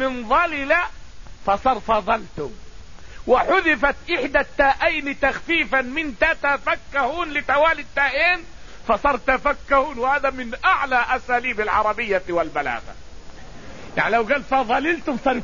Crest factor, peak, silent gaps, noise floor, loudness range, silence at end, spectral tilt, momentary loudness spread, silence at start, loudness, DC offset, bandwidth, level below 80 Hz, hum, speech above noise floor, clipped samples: 18 dB; -4 dBFS; none; -40 dBFS; 3 LU; 0 s; -4.5 dB/octave; 7 LU; 0 s; -20 LUFS; 1%; 7.4 kHz; -40 dBFS; none; 19 dB; under 0.1%